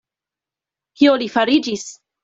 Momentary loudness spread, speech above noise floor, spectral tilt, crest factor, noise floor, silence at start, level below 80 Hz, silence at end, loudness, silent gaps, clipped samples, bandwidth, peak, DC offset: 13 LU; 72 dB; -3.5 dB/octave; 18 dB; -88 dBFS; 1 s; -62 dBFS; 0.3 s; -17 LUFS; none; under 0.1%; 7.8 kHz; -2 dBFS; under 0.1%